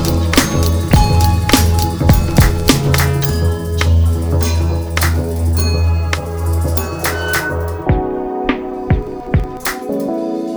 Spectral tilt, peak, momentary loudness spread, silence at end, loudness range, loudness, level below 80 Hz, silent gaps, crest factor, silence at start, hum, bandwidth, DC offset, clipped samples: -5.5 dB/octave; 0 dBFS; 7 LU; 0 s; 5 LU; -15 LUFS; -20 dBFS; none; 14 dB; 0 s; none; over 20 kHz; under 0.1%; under 0.1%